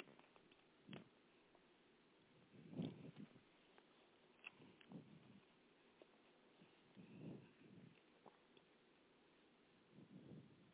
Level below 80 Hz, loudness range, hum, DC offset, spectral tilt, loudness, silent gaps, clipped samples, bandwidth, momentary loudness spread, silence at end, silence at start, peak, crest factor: under -90 dBFS; 6 LU; none; under 0.1%; -6 dB/octave; -61 LUFS; none; under 0.1%; 4 kHz; 16 LU; 0 s; 0 s; -36 dBFS; 28 dB